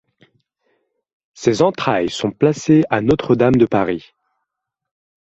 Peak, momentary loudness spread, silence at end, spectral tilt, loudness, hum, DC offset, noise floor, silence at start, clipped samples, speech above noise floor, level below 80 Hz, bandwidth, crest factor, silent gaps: -2 dBFS; 7 LU; 1.25 s; -6.5 dB/octave; -16 LUFS; none; under 0.1%; -79 dBFS; 1.4 s; under 0.1%; 64 dB; -48 dBFS; 8.2 kHz; 16 dB; none